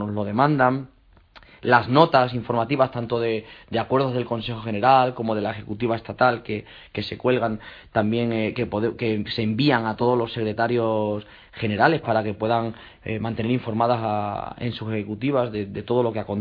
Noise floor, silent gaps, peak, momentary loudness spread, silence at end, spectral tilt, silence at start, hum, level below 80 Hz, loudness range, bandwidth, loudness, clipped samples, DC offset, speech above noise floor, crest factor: -51 dBFS; none; 0 dBFS; 12 LU; 0 s; -9 dB/octave; 0 s; none; -54 dBFS; 3 LU; 5.2 kHz; -23 LUFS; under 0.1%; under 0.1%; 29 dB; 22 dB